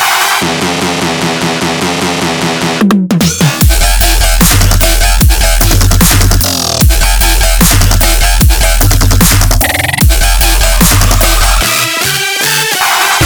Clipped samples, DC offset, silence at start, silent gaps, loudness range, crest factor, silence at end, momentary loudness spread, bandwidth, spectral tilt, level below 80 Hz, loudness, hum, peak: 0.6%; under 0.1%; 0 s; none; 2 LU; 8 dB; 0 s; 5 LU; over 20 kHz; -3 dB/octave; -12 dBFS; -8 LUFS; none; 0 dBFS